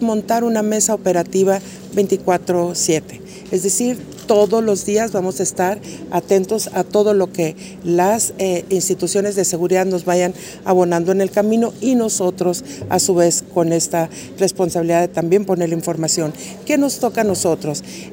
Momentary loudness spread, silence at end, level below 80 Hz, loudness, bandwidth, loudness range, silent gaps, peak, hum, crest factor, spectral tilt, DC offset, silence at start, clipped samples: 7 LU; 0 s; -54 dBFS; -17 LUFS; 16.5 kHz; 1 LU; none; -2 dBFS; none; 16 dB; -4.5 dB/octave; under 0.1%; 0 s; under 0.1%